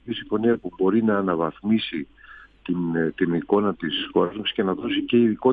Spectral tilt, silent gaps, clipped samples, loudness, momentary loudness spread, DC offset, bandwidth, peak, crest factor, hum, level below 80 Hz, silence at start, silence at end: -9.5 dB/octave; none; under 0.1%; -23 LUFS; 8 LU; under 0.1%; 4.8 kHz; -6 dBFS; 18 dB; none; -58 dBFS; 0.05 s; 0 s